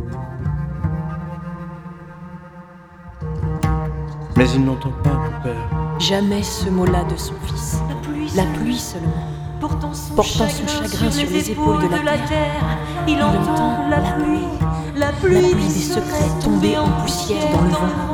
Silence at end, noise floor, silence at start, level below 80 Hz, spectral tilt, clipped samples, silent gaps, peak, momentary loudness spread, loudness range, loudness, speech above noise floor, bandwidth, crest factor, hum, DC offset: 0 s; -40 dBFS; 0 s; -30 dBFS; -5.5 dB/octave; under 0.1%; none; -2 dBFS; 12 LU; 6 LU; -19 LUFS; 22 dB; 18 kHz; 18 dB; none; under 0.1%